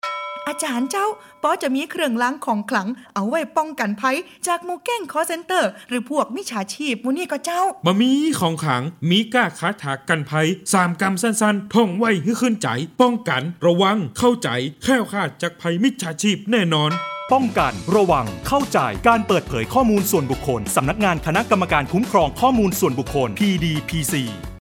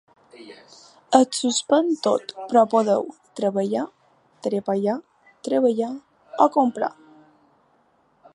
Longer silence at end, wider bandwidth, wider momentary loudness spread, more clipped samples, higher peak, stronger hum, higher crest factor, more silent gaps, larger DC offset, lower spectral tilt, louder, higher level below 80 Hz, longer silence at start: second, 0.05 s vs 1.45 s; first, 17.5 kHz vs 11.5 kHz; second, 7 LU vs 13 LU; neither; about the same, 0 dBFS vs 0 dBFS; neither; about the same, 20 dB vs 22 dB; neither; neither; about the same, -4.5 dB/octave vs -4.5 dB/octave; about the same, -20 LUFS vs -22 LUFS; first, -44 dBFS vs -76 dBFS; second, 0.05 s vs 0.35 s